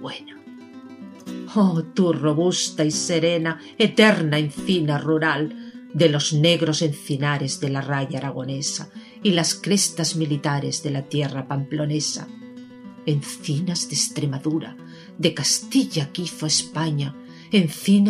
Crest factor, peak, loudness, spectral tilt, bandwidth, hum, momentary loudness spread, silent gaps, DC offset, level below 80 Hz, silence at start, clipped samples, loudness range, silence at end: 20 dB; -2 dBFS; -22 LUFS; -4.5 dB/octave; 15.5 kHz; none; 19 LU; none; under 0.1%; -66 dBFS; 0 s; under 0.1%; 6 LU; 0 s